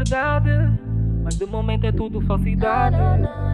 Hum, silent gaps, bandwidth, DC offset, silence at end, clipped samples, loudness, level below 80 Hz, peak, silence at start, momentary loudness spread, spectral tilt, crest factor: none; none; 10.5 kHz; under 0.1%; 0 s; under 0.1%; -21 LUFS; -26 dBFS; -6 dBFS; 0 s; 5 LU; -7.5 dB/octave; 12 dB